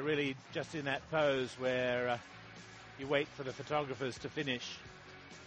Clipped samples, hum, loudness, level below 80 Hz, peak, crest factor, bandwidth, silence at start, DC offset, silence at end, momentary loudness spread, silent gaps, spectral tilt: under 0.1%; none; -37 LUFS; -68 dBFS; -18 dBFS; 20 dB; 8.4 kHz; 0 s; under 0.1%; 0 s; 18 LU; none; -5 dB/octave